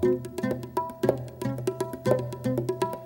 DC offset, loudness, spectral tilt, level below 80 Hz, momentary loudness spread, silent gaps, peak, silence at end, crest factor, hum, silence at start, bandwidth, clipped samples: under 0.1%; -29 LUFS; -7 dB/octave; -56 dBFS; 5 LU; none; -6 dBFS; 0 s; 22 dB; none; 0 s; 18 kHz; under 0.1%